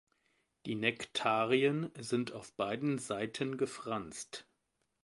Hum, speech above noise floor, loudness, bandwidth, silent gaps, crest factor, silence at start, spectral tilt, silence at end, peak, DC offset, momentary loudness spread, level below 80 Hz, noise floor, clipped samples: none; 46 dB; -35 LUFS; 11.5 kHz; none; 24 dB; 0.65 s; -4.5 dB/octave; 0.6 s; -12 dBFS; under 0.1%; 14 LU; -74 dBFS; -82 dBFS; under 0.1%